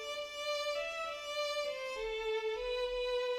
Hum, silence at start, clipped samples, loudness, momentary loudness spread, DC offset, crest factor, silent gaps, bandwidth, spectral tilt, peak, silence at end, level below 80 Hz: none; 0 s; under 0.1%; -37 LUFS; 4 LU; under 0.1%; 12 dB; none; 15.5 kHz; -0.5 dB/octave; -26 dBFS; 0 s; -60 dBFS